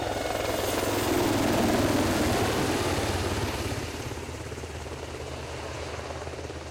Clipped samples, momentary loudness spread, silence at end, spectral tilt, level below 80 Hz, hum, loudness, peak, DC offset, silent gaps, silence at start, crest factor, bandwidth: under 0.1%; 12 LU; 0 s; -4.5 dB/octave; -44 dBFS; none; -28 LUFS; -18 dBFS; under 0.1%; none; 0 s; 12 dB; 16.5 kHz